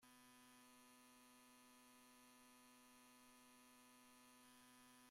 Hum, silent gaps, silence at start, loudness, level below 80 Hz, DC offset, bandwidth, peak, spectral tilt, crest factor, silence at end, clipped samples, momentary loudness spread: none; none; 0 s; -68 LUFS; under -90 dBFS; under 0.1%; 16 kHz; -56 dBFS; -1.5 dB/octave; 12 dB; 0 s; under 0.1%; 1 LU